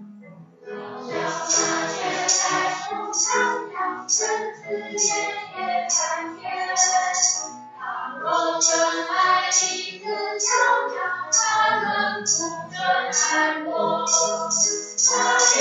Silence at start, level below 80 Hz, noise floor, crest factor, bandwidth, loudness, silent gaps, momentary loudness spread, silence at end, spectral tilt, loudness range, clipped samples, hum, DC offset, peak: 0 s; -80 dBFS; -45 dBFS; 18 dB; 8.4 kHz; -21 LUFS; none; 11 LU; 0 s; 0 dB/octave; 3 LU; under 0.1%; none; under 0.1%; -4 dBFS